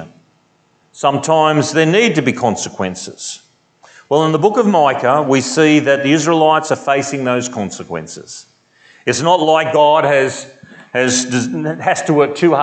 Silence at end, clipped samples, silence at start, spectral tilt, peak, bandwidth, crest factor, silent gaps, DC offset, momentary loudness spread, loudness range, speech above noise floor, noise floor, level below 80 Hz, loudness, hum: 0 s; under 0.1%; 0 s; -4.5 dB/octave; 0 dBFS; 9.2 kHz; 14 dB; none; under 0.1%; 14 LU; 3 LU; 43 dB; -57 dBFS; -64 dBFS; -14 LUFS; none